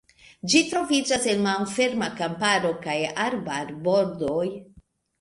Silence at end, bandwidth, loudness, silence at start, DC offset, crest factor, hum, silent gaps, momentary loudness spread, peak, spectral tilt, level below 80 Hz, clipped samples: 0.4 s; 11.5 kHz; -24 LUFS; 0.45 s; under 0.1%; 18 dB; none; none; 8 LU; -6 dBFS; -3.5 dB/octave; -60 dBFS; under 0.1%